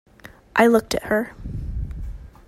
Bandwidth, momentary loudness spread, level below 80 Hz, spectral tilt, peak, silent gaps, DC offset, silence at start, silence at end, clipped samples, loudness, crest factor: 16 kHz; 17 LU; -36 dBFS; -5.5 dB/octave; -2 dBFS; none; under 0.1%; 0.25 s; 0.2 s; under 0.1%; -21 LUFS; 22 dB